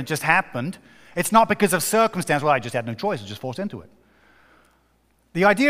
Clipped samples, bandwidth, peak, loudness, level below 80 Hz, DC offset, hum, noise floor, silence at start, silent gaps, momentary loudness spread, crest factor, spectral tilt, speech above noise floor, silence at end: under 0.1%; 16 kHz; -2 dBFS; -22 LUFS; -58 dBFS; under 0.1%; none; -63 dBFS; 0 s; none; 14 LU; 20 dB; -4.5 dB/octave; 42 dB; 0 s